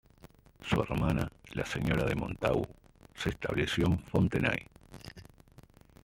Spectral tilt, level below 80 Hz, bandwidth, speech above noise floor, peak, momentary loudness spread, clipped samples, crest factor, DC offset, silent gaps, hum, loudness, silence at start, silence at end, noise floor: -6.5 dB/octave; -48 dBFS; 16.5 kHz; 27 dB; -12 dBFS; 18 LU; under 0.1%; 22 dB; under 0.1%; none; none; -32 LUFS; 0.25 s; 0.8 s; -58 dBFS